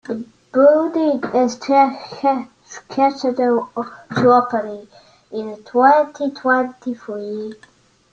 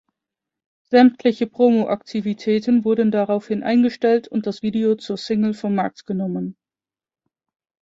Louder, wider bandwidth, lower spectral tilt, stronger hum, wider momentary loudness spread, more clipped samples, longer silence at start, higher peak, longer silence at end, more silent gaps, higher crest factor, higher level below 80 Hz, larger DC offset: about the same, -17 LUFS vs -19 LUFS; about the same, 7.6 kHz vs 7.6 kHz; second, -6 dB/octave vs -7.5 dB/octave; neither; first, 16 LU vs 10 LU; neither; second, 0.1 s vs 0.9 s; about the same, -2 dBFS vs -2 dBFS; second, 0.6 s vs 1.3 s; neither; about the same, 16 dB vs 18 dB; about the same, -64 dBFS vs -64 dBFS; neither